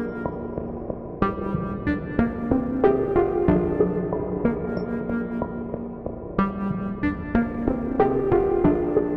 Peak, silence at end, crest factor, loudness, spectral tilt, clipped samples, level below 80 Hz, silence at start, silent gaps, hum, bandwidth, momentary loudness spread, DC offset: -4 dBFS; 0 s; 20 dB; -24 LUFS; -11 dB/octave; under 0.1%; -40 dBFS; 0 s; none; none; 5.8 kHz; 11 LU; under 0.1%